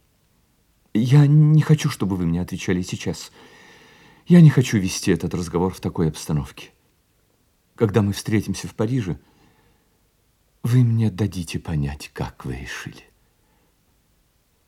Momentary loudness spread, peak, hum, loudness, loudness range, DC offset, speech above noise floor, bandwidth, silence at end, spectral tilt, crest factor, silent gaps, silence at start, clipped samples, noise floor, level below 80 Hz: 17 LU; -2 dBFS; none; -20 LUFS; 6 LU; under 0.1%; 44 dB; 14 kHz; 1.7 s; -7 dB/octave; 18 dB; none; 0.95 s; under 0.1%; -63 dBFS; -48 dBFS